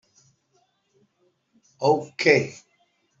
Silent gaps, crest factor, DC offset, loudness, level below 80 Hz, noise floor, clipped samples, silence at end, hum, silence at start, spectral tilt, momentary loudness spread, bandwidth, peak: none; 24 dB; under 0.1%; -22 LUFS; -68 dBFS; -69 dBFS; under 0.1%; 0.65 s; none; 1.8 s; -5 dB/octave; 7 LU; 7.8 kHz; -4 dBFS